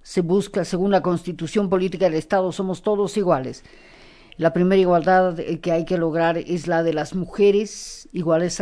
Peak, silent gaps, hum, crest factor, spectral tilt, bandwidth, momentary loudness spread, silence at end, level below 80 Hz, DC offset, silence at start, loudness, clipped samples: -4 dBFS; none; none; 16 dB; -6 dB/octave; 11 kHz; 9 LU; 0 s; -48 dBFS; under 0.1%; 0.05 s; -21 LUFS; under 0.1%